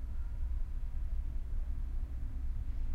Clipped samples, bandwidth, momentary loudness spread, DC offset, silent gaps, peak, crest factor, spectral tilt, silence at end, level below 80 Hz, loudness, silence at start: under 0.1%; 2.8 kHz; 2 LU; under 0.1%; none; -24 dBFS; 10 dB; -8 dB/octave; 0 s; -36 dBFS; -42 LUFS; 0 s